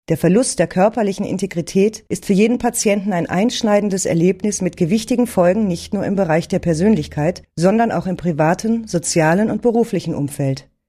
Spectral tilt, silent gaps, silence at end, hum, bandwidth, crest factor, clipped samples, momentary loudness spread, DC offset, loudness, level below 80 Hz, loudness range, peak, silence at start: -5.5 dB/octave; none; 0.25 s; none; 15 kHz; 16 dB; under 0.1%; 6 LU; under 0.1%; -17 LUFS; -46 dBFS; 1 LU; -2 dBFS; 0.1 s